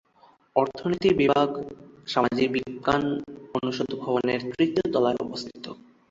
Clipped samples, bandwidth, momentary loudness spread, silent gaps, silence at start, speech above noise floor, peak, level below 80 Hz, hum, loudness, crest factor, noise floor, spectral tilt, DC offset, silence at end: under 0.1%; 7.8 kHz; 14 LU; none; 0.55 s; 34 dB; -4 dBFS; -58 dBFS; none; -25 LUFS; 22 dB; -59 dBFS; -6 dB/octave; under 0.1%; 0.35 s